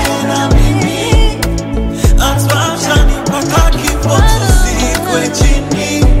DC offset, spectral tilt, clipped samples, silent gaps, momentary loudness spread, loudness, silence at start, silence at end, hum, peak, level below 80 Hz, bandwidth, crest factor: under 0.1%; -4.5 dB/octave; under 0.1%; none; 4 LU; -12 LUFS; 0 s; 0 s; none; 0 dBFS; -12 dBFS; 16.5 kHz; 10 dB